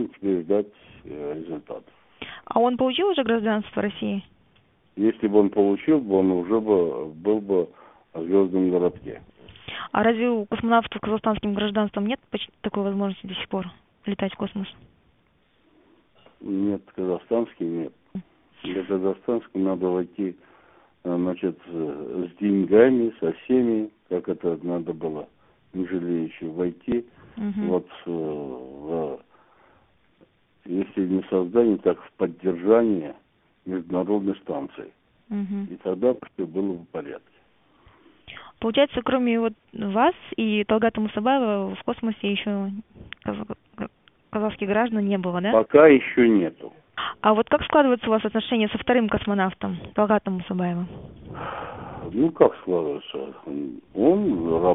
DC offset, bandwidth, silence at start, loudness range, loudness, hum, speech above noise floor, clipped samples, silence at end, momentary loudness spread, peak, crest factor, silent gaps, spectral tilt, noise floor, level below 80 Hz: under 0.1%; 3.9 kHz; 0 s; 9 LU; -24 LUFS; none; 40 dB; under 0.1%; 0 s; 16 LU; -2 dBFS; 24 dB; none; -11 dB/octave; -64 dBFS; -56 dBFS